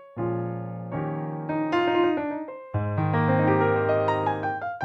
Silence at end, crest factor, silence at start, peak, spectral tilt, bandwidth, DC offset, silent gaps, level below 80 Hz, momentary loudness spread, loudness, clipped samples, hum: 0 s; 14 dB; 0 s; -10 dBFS; -9 dB/octave; 7 kHz; under 0.1%; none; -58 dBFS; 11 LU; -26 LUFS; under 0.1%; none